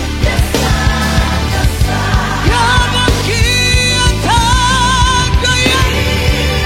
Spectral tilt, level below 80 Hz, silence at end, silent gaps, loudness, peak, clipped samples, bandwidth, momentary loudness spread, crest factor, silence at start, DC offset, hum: -3.5 dB/octave; -16 dBFS; 0 s; none; -11 LUFS; 0 dBFS; under 0.1%; 16.5 kHz; 4 LU; 12 dB; 0 s; under 0.1%; none